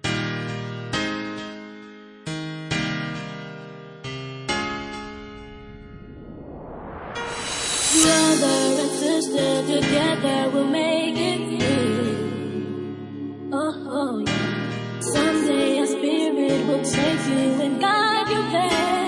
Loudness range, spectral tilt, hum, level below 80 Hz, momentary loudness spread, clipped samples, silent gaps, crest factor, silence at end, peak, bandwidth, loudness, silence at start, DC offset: 12 LU; -3.5 dB/octave; none; -52 dBFS; 19 LU; under 0.1%; none; 20 dB; 0 s; -4 dBFS; 11.5 kHz; -22 LUFS; 0.05 s; under 0.1%